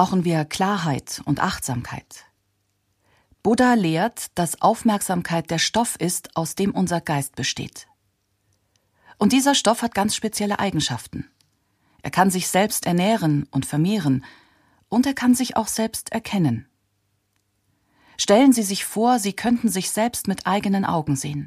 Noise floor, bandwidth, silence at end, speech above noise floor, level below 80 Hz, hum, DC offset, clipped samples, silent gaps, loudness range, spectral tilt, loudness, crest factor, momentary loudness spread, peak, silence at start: -70 dBFS; 15.5 kHz; 0 s; 49 dB; -54 dBFS; none; under 0.1%; under 0.1%; none; 4 LU; -4.5 dB/octave; -21 LUFS; 20 dB; 9 LU; -2 dBFS; 0 s